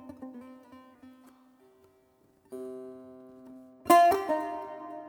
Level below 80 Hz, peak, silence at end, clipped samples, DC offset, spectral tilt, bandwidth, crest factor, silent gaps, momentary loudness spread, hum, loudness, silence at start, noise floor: -72 dBFS; -8 dBFS; 0 s; under 0.1%; under 0.1%; -3.5 dB/octave; 19.5 kHz; 22 dB; none; 29 LU; none; -25 LUFS; 0.05 s; -65 dBFS